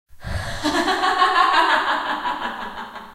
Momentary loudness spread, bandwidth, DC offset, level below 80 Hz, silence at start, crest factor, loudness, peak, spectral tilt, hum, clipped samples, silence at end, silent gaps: 15 LU; 16 kHz; under 0.1%; -40 dBFS; 0.15 s; 18 dB; -19 LUFS; -4 dBFS; -3.5 dB/octave; none; under 0.1%; 0 s; none